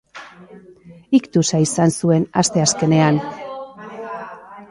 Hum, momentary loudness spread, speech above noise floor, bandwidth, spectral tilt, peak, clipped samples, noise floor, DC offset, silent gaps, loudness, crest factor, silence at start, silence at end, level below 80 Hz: none; 19 LU; 28 dB; 11.5 kHz; -5 dB/octave; -2 dBFS; under 0.1%; -44 dBFS; under 0.1%; none; -17 LUFS; 18 dB; 0.15 s; 0.05 s; -56 dBFS